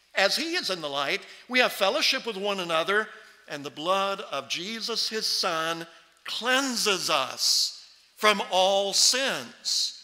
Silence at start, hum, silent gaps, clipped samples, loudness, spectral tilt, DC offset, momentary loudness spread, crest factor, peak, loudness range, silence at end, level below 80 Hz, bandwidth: 0.15 s; none; none; under 0.1%; -25 LUFS; -1 dB/octave; under 0.1%; 11 LU; 22 dB; -6 dBFS; 5 LU; 0 s; -78 dBFS; 16 kHz